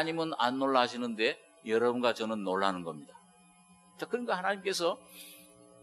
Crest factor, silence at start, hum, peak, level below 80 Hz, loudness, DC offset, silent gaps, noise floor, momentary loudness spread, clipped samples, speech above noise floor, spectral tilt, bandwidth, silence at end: 22 dB; 0 s; none; -10 dBFS; -82 dBFS; -31 LUFS; under 0.1%; none; -61 dBFS; 16 LU; under 0.1%; 30 dB; -4 dB/octave; 13 kHz; 0.4 s